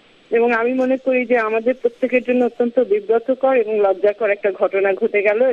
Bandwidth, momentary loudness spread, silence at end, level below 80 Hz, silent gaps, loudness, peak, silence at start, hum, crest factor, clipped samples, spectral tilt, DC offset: 6.4 kHz; 3 LU; 0 s; -66 dBFS; none; -18 LUFS; -4 dBFS; 0.3 s; none; 14 dB; under 0.1%; -6.5 dB/octave; under 0.1%